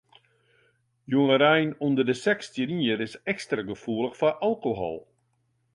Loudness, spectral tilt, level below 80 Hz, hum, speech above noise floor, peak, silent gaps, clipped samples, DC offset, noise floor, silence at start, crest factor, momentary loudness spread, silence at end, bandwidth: -26 LUFS; -6 dB/octave; -64 dBFS; none; 46 dB; -8 dBFS; none; under 0.1%; under 0.1%; -71 dBFS; 1.1 s; 18 dB; 11 LU; 0.75 s; 11 kHz